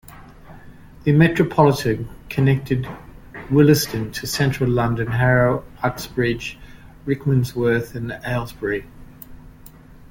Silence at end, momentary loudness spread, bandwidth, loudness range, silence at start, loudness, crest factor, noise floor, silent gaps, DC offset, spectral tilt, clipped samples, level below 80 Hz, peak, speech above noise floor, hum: 0.05 s; 13 LU; 17 kHz; 6 LU; 0.1 s; -20 LUFS; 18 dB; -43 dBFS; none; under 0.1%; -6.5 dB/octave; under 0.1%; -42 dBFS; -2 dBFS; 25 dB; none